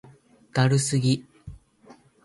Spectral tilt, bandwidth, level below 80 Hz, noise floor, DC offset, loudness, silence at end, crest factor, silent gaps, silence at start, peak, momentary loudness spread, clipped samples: -5 dB/octave; 11.5 kHz; -54 dBFS; -54 dBFS; under 0.1%; -24 LUFS; 0.7 s; 20 dB; none; 0.55 s; -6 dBFS; 9 LU; under 0.1%